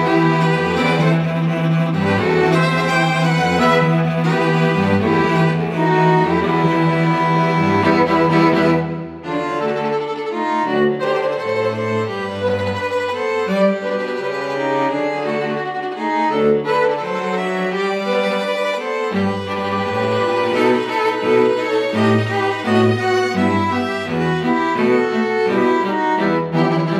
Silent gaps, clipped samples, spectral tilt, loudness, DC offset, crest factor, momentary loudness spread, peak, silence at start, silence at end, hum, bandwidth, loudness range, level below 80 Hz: none; under 0.1%; -7 dB/octave; -17 LUFS; under 0.1%; 14 dB; 6 LU; -2 dBFS; 0 s; 0 s; none; 12 kHz; 4 LU; -54 dBFS